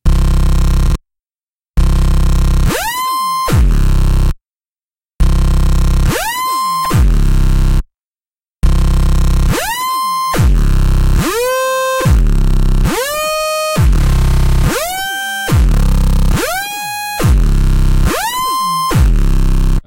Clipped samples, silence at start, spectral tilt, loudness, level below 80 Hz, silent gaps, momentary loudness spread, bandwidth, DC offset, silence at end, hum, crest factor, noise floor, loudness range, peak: under 0.1%; 0.05 s; -5 dB/octave; -14 LUFS; -12 dBFS; 4.68-4.72 s, 4.84-4.88 s, 5.13-5.17 s, 8.07-8.11 s, 8.31-8.35 s, 8.56-8.60 s; 5 LU; 16.5 kHz; under 0.1%; 0.05 s; none; 10 dB; under -90 dBFS; 2 LU; 0 dBFS